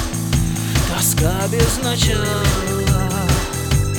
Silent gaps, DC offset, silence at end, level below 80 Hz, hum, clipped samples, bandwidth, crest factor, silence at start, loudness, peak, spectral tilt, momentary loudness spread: none; under 0.1%; 0 s; -24 dBFS; none; under 0.1%; over 20 kHz; 16 dB; 0 s; -18 LUFS; -2 dBFS; -4.5 dB/octave; 3 LU